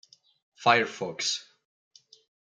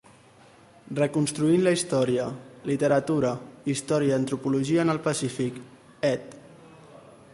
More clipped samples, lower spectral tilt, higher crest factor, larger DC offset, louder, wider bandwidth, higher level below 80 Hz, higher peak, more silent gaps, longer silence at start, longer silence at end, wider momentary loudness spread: neither; second, -2 dB/octave vs -5.5 dB/octave; first, 24 dB vs 16 dB; neither; about the same, -26 LUFS vs -26 LUFS; second, 9.6 kHz vs 11.5 kHz; second, -82 dBFS vs -64 dBFS; first, -6 dBFS vs -10 dBFS; neither; second, 0.6 s vs 0.85 s; first, 1.1 s vs 0.25 s; about the same, 9 LU vs 11 LU